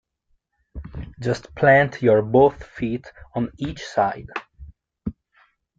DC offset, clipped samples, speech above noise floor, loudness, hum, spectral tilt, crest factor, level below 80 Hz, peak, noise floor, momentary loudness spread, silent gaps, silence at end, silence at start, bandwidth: under 0.1%; under 0.1%; 48 dB; -21 LUFS; none; -7 dB/octave; 20 dB; -46 dBFS; -4 dBFS; -69 dBFS; 20 LU; none; 0.65 s; 0.75 s; 7.8 kHz